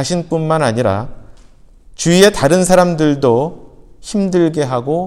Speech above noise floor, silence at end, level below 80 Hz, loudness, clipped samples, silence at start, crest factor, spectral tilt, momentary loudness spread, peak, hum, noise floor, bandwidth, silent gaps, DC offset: 29 dB; 0 s; -40 dBFS; -14 LUFS; under 0.1%; 0 s; 14 dB; -5 dB/octave; 12 LU; 0 dBFS; none; -42 dBFS; 16 kHz; none; under 0.1%